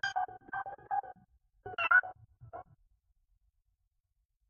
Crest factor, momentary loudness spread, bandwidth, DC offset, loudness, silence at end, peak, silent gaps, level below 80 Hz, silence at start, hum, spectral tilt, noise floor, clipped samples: 24 dB; 25 LU; 6.6 kHz; under 0.1%; -32 LUFS; 1.85 s; -14 dBFS; none; -72 dBFS; 0.05 s; none; 1 dB/octave; -81 dBFS; under 0.1%